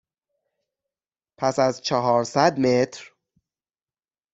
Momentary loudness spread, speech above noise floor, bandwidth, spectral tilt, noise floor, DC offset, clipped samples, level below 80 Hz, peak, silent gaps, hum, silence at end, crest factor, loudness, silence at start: 8 LU; over 69 dB; 8.2 kHz; -5 dB/octave; under -90 dBFS; under 0.1%; under 0.1%; -64 dBFS; -2 dBFS; none; none; 1.3 s; 22 dB; -22 LUFS; 1.4 s